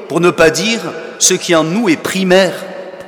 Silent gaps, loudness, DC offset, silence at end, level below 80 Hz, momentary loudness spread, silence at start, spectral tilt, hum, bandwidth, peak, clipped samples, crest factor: none; -12 LUFS; under 0.1%; 0 s; -46 dBFS; 11 LU; 0 s; -3.5 dB/octave; none; 18.5 kHz; 0 dBFS; 0.2%; 14 dB